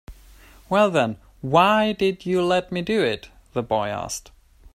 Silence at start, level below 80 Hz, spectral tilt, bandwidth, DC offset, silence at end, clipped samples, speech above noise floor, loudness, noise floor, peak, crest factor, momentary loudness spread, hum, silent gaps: 0.1 s; -50 dBFS; -5 dB/octave; 15.5 kHz; under 0.1%; 0.55 s; under 0.1%; 27 dB; -22 LUFS; -48 dBFS; -2 dBFS; 20 dB; 13 LU; none; none